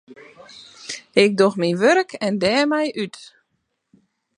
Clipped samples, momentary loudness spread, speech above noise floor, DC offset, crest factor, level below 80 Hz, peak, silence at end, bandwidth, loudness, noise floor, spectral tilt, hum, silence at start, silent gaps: under 0.1%; 16 LU; 55 dB; under 0.1%; 20 dB; -64 dBFS; 0 dBFS; 1.1 s; 11 kHz; -19 LUFS; -73 dBFS; -5 dB/octave; none; 0.1 s; none